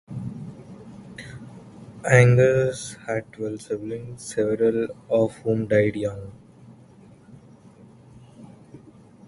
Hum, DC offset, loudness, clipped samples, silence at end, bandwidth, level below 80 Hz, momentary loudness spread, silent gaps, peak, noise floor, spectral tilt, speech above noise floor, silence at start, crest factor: none; under 0.1%; -23 LUFS; under 0.1%; 0.5 s; 11.5 kHz; -54 dBFS; 26 LU; none; 0 dBFS; -50 dBFS; -6.5 dB/octave; 28 dB; 0.1 s; 24 dB